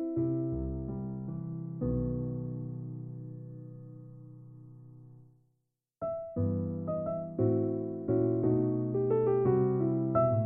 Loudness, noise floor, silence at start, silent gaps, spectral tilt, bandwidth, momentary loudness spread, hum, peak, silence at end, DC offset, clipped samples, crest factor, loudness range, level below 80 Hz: -32 LUFS; -81 dBFS; 0 s; none; -10 dB/octave; 2.8 kHz; 21 LU; none; -16 dBFS; 0 s; under 0.1%; under 0.1%; 16 dB; 15 LU; -52 dBFS